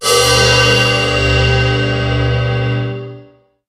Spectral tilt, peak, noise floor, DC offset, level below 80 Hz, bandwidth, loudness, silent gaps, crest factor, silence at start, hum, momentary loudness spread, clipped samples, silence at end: -4 dB/octave; 0 dBFS; -43 dBFS; under 0.1%; -26 dBFS; 14.5 kHz; -12 LUFS; none; 14 dB; 0 s; none; 11 LU; under 0.1%; 0.45 s